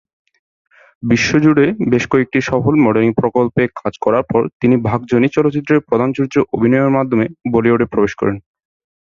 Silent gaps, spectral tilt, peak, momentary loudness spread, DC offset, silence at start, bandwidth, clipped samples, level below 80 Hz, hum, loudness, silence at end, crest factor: 4.53-4.60 s; -7 dB/octave; -2 dBFS; 5 LU; under 0.1%; 1.05 s; 7.4 kHz; under 0.1%; -46 dBFS; none; -15 LUFS; 0.7 s; 14 dB